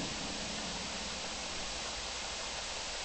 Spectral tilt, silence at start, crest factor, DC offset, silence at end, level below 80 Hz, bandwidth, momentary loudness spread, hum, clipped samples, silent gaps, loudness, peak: -1.5 dB/octave; 0 s; 12 dB; under 0.1%; 0 s; -54 dBFS; 8.4 kHz; 1 LU; none; under 0.1%; none; -38 LUFS; -26 dBFS